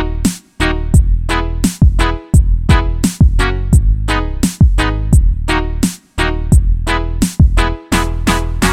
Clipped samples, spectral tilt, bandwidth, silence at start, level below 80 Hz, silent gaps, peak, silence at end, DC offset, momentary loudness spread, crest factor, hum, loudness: under 0.1%; -5.5 dB/octave; 15.5 kHz; 0 s; -14 dBFS; none; 0 dBFS; 0 s; under 0.1%; 6 LU; 12 dB; none; -14 LUFS